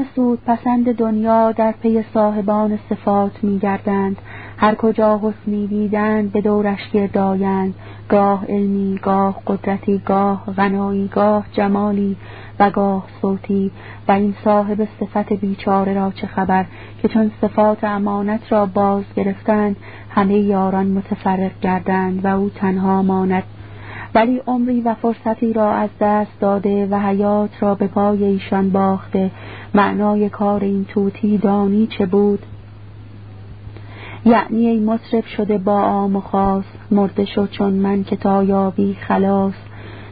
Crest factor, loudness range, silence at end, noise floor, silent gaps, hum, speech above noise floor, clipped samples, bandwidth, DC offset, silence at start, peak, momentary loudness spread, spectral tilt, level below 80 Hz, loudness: 16 dB; 1 LU; 0 s; -36 dBFS; none; none; 20 dB; under 0.1%; 4.8 kHz; 0.5%; 0 s; 0 dBFS; 7 LU; -13 dB/octave; -46 dBFS; -17 LUFS